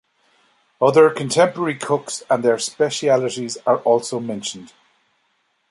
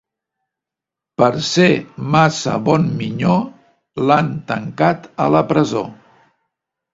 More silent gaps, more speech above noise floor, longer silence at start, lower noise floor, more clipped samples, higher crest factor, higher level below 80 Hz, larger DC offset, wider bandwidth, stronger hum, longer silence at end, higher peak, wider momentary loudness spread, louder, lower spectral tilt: neither; second, 48 dB vs 70 dB; second, 0.8 s vs 1.2 s; second, -67 dBFS vs -85 dBFS; neither; about the same, 18 dB vs 18 dB; second, -68 dBFS vs -52 dBFS; neither; first, 11.5 kHz vs 7.8 kHz; neither; about the same, 1.05 s vs 1 s; about the same, -2 dBFS vs 0 dBFS; about the same, 11 LU vs 10 LU; about the same, -19 LUFS vs -17 LUFS; second, -4 dB/octave vs -6 dB/octave